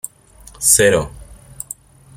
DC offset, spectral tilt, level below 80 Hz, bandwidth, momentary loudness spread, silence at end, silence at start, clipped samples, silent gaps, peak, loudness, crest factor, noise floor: under 0.1%; -2.5 dB/octave; -42 dBFS; 17 kHz; 22 LU; 0.85 s; 0.6 s; under 0.1%; none; 0 dBFS; -13 LUFS; 20 dB; -44 dBFS